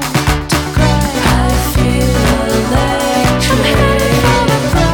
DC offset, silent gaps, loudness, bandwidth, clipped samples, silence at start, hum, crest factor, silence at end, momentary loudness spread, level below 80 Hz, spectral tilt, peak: under 0.1%; none; -12 LUFS; 19.5 kHz; under 0.1%; 0 s; none; 10 dB; 0 s; 3 LU; -20 dBFS; -5 dB/octave; -2 dBFS